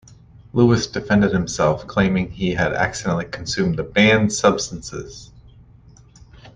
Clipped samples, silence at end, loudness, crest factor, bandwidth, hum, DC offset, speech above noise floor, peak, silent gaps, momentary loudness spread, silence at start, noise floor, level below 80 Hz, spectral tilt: under 0.1%; 0.05 s; -19 LUFS; 18 dB; 9.8 kHz; none; under 0.1%; 29 dB; -2 dBFS; none; 13 LU; 0.55 s; -47 dBFS; -44 dBFS; -5 dB/octave